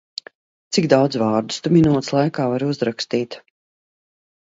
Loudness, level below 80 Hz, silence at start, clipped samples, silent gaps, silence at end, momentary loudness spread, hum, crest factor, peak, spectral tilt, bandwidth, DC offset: -19 LUFS; -54 dBFS; 0.7 s; under 0.1%; none; 1.1 s; 15 LU; none; 20 dB; 0 dBFS; -6 dB/octave; 8 kHz; under 0.1%